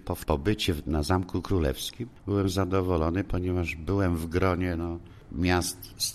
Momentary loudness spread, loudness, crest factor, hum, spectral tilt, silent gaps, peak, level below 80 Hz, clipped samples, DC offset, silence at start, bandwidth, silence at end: 7 LU; -28 LUFS; 18 dB; none; -5.5 dB/octave; none; -10 dBFS; -40 dBFS; under 0.1%; under 0.1%; 0.05 s; 13.5 kHz; 0 s